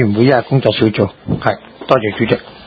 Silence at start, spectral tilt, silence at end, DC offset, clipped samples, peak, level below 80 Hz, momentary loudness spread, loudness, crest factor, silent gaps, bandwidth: 0 s; -9 dB/octave; 0.05 s; under 0.1%; 0.1%; 0 dBFS; -42 dBFS; 7 LU; -15 LUFS; 14 dB; none; 6.4 kHz